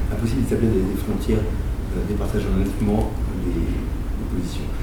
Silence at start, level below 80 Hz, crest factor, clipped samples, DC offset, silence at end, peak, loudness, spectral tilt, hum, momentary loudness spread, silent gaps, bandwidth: 0 s; -26 dBFS; 14 dB; under 0.1%; under 0.1%; 0 s; -8 dBFS; -24 LUFS; -7.5 dB/octave; none; 7 LU; none; over 20 kHz